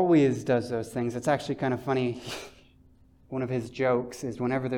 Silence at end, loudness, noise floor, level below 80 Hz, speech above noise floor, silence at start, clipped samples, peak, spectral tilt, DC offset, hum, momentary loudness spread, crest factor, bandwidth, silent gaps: 0 s; -28 LUFS; -58 dBFS; -60 dBFS; 31 dB; 0 s; under 0.1%; -12 dBFS; -6.5 dB/octave; under 0.1%; none; 13 LU; 16 dB; 17.5 kHz; none